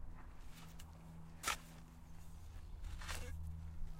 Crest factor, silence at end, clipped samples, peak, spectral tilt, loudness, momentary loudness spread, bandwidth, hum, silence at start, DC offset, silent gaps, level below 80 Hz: 26 dB; 0 s; under 0.1%; -22 dBFS; -3 dB/octave; -50 LUFS; 16 LU; 16 kHz; none; 0 s; under 0.1%; none; -52 dBFS